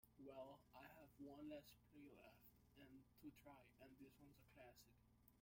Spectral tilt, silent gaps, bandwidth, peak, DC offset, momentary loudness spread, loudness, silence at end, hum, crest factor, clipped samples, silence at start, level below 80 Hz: -5.5 dB/octave; none; 16.5 kHz; -46 dBFS; under 0.1%; 9 LU; -64 LUFS; 0 s; none; 18 dB; under 0.1%; 0.05 s; -82 dBFS